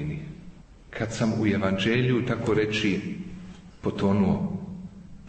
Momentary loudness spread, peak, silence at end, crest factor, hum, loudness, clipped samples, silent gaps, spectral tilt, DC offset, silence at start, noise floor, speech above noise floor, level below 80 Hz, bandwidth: 18 LU; -12 dBFS; 0 s; 16 dB; none; -26 LUFS; under 0.1%; none; -6.5 dB/octave; under 0.1%; 0 s; -46 dBFS; 22 dB; -50 dBFS; 8.6 kHz